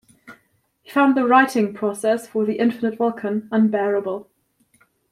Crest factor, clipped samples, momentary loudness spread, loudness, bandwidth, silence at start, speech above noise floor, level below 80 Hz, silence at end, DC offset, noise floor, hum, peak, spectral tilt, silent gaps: 18 dB; under 0.1%; 9 LU; -20 LUFS; 15 kHz; 0.3 s; 44 dB; -70 dBFS; 0.9 s; under 0.1%; -64 dBFS; none; -2 dBFS; -6 dB/octave; none